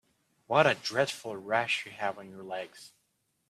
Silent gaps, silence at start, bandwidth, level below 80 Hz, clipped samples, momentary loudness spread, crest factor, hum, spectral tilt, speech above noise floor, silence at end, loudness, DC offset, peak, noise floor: none; 0.5 s; 14 kHz; -74 dBFS; under 0.1%; 15 LU; 24 dB; none; -4 dB/octave; 46 dB; 0.6 s; -30 LUFS; under 0.1%; -8 dBFS; -77 dBFS